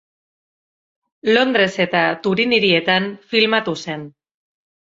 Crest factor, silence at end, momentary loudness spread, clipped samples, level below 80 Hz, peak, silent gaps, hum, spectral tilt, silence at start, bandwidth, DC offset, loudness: 18 dB; 0.85 s; 11 LU; under 0.1%; -62 dBFS; -2 dBFS; none; none; -5 dB/octave; 1.25 s; 7.8 kHz; under 0.1%; -17 LUFS